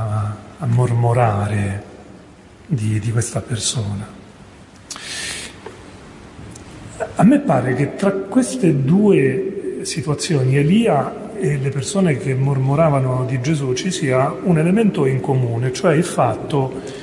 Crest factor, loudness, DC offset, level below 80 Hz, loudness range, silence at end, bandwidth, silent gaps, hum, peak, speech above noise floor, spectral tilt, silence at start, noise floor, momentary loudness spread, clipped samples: 14 dB; -18 LUFS; under 0.1%; -50 dBFS; 7 LU; 0 s; 11.5 kHz; none; none; -4 dBFS; 26 dB; -6 dB/octave; 0 s; -43 dBFS; 15 LU; under 0.1%